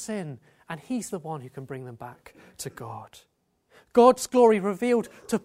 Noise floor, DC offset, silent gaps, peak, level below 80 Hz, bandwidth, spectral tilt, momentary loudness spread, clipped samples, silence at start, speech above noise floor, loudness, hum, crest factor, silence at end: -61 dBFS; under 0.1%; none; -4 dBFS; -66 dBFS; 15.5 kHz; -5.5 dB/octave; 22 LU; under 0.1%; 0 s; 36 dB; -23 LUFS; none; 22 dB; 0.05 s